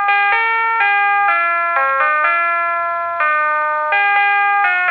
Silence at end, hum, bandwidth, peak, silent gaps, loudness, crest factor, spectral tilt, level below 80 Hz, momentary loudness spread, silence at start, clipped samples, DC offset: 0 s; none; 5.6 kHz; 0 dBFS; none; -14 LUFS; 14 dB; -3 dB/octave; -64 dBFS; 4 LU; 0 s; under 0.1%; under 0.1%